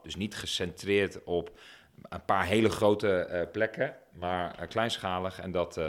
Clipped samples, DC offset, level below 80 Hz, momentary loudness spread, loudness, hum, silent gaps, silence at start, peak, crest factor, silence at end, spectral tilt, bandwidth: under 0.1%; under 0.1%; -58 dBFS; 9 LU; -30 LUFS; none; none; 0.05 s; -10 dBFS; 22 dB; 0 s; -5 dB/octave; 16.5 kHz